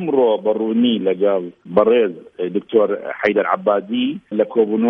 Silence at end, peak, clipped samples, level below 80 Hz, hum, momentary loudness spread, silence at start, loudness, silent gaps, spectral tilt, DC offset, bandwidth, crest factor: 0 s; -2 dBFS; under 0.1%; -64 dBFS; none; 7 LU; 0 s; -18 LUFS; none; -8.5 dB/octave; under 0.1%; 5.4 kHz; 16 dB